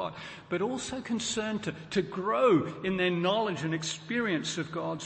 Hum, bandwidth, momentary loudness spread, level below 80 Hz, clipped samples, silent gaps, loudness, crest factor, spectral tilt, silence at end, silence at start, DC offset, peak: none; 8.8 kHz; 9 LU; -64 dBFS; under 0.1%; none; -30 LUFS; 16 dB; -4.5 dB/octave; 0 s; 0 s; under 0.1%; -14 dBFS